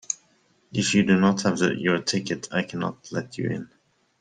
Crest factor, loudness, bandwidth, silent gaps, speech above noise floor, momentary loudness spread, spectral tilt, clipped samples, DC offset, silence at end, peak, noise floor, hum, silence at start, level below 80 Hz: 18 dB; -24 LUFS; 9.6 kHz; none; 40 dB; 12 LU; -4.5 dB/octave; under 0.1%; under 0.1%; 0.55 s; -8 dBFS; -63 dBFS; none; 0.1 s; -62 dBFS